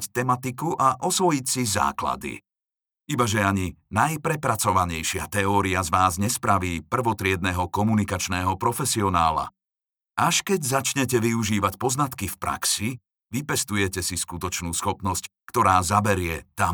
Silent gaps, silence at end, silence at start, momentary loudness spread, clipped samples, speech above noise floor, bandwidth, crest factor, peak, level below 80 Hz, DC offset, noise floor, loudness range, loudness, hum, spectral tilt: none; 0 s; 0 s; 7 LU; under 0.1%; over 66 dB; over 20 kHz; 20 dB; -4 dBFS; -48 dBFS; under 0.1%; under -90 dBFS; 2 LU; -24 LUFS; none; -4 dB/octave